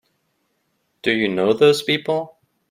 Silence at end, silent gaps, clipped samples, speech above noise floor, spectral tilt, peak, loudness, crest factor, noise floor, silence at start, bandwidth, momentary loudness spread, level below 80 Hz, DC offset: 0.45 s; none; under 0.1%; 52 dB; -5 dB/octave; -2 dBFS; -19 LUFS; 20 dB; -69 dBFS; 1.05 s; 16 kHz; 10 LU; -62 dBFS; under 0.1%